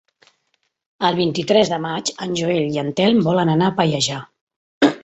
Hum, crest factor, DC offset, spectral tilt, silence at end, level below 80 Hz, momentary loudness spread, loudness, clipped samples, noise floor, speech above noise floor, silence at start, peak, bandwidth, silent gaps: none; 18 dB; under 0.1%; -5 dB/octave; 0.05 s; -58 dBFS; 6 LU; -19 LUFS; under 0.1%; -69 dBFS; 51 dB; 1 s; -2 dBFS; 8.4 kHz; 4.41-4.47 s, 4.56-4.81 s